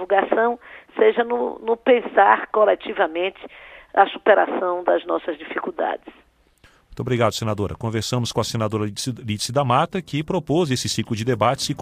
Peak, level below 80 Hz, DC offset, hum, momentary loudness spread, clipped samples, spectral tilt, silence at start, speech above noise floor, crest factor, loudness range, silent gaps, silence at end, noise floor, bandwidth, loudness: 0 dBFS; -54 dBFS; under 0.1%; none; 10 LU; under 0.1%; -5 dB/octave; 0 s; 35 dB; 20 dB; 6 LU; none; 0 s; -56 dBFS; 15.5 kHz; -21 LUFS